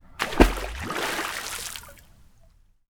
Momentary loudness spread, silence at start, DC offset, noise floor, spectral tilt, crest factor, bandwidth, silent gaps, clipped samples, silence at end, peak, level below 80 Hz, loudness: 13 LU; 0.15 s; under 0.1%; -56 dBFS; -4 dB/octave; 28 dB; 20 kHz; none; under 0.1%; 0.9 s; 0 dBFS; -32 dBFS; -26 LUFS